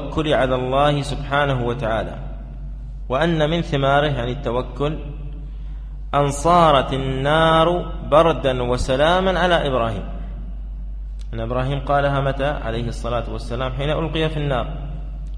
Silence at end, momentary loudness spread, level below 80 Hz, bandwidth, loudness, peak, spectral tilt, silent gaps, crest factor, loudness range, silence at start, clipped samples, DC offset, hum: 0 s; 18 LU; -30 dBFS; 11 kHz; -20 LUFS; -2 dBFS; -6 dB/octave; none; 18 dB; 6 LU; 0 s; under 0.1%; under 0.1%; none